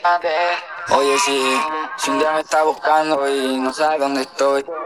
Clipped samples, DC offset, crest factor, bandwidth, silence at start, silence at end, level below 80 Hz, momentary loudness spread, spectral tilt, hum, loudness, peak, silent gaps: under 0.1%; under 0.1%; 16 dB; 14.5 kHz; 0 s; 0 s; -66 dBFS; 5 LU; -2 dB/octave; none; -18 LUFS; -2 dBFS; none